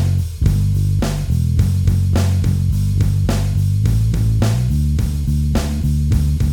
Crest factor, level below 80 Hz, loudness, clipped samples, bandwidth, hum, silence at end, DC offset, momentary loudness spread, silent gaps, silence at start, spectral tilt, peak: 12 dB; -22 dBFS; -17 LUFS; under 0.1%; 17 kHz; none; 0 s; under 0.1%; 3 LU; none; 0 s; -7 dB/octave; -4 dBFS